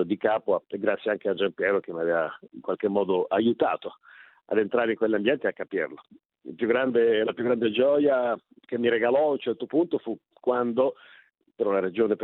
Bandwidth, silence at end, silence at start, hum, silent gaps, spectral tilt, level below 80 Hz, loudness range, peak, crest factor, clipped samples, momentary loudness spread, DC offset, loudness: 4.1 kHz; 0 s; 0 s; none; none; -9.5 dB/octave; -72 dBFS; 3 LU; -10 dBFS; 16 dB; under 0.1%; 9 LU; under 0.1%; -26 LUFS